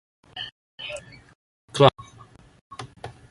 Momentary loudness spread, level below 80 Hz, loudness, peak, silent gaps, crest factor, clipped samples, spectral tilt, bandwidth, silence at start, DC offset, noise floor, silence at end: 25 LU; -58 dBFS; -23 LUFS; -2 dBFS; 0.52-0.78 s, 1.35-1.68 s, 2.61-2.70 s; 26 dB; under 0.1%; -5.5 dB/octave; 11.5 kHz; 0.35 s; under 0.1%; -51 dBFS; 0.2 s